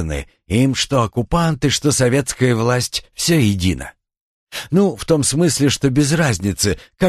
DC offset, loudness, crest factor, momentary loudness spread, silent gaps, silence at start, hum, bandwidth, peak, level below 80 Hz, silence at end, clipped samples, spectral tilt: under 0.1%; -17 LUFS; 16 dB; 7 LU; 4.21-4.47 s; 0 s; none; 13 kHz; 0 dBFS; -36 dBFS; 0 s; under 0.1%; -4.5 dB/octave